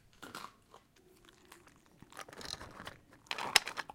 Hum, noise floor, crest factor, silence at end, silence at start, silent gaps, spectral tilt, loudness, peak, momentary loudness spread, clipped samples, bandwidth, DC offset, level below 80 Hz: none; -65 dBFS; 38 dB; 0 s; 0.2 s; none; 0 dB/octave; -35 LUFS; -4 dBFS; 23 LU; under 0.1%; 17 kHz; under 0.1%; -68 dBFS